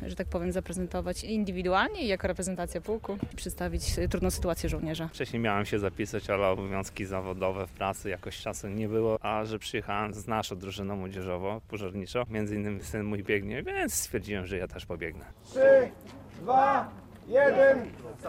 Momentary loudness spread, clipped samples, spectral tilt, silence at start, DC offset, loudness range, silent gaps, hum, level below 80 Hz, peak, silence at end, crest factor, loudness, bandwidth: 13 LU; under 0.1%; -5 dB/octave; 0 s; under 0.1%; 6 LU; none; none; -46 dBFS; -12 dBFS; 0 s; 18 dB; -30 LUFS; 16 kHz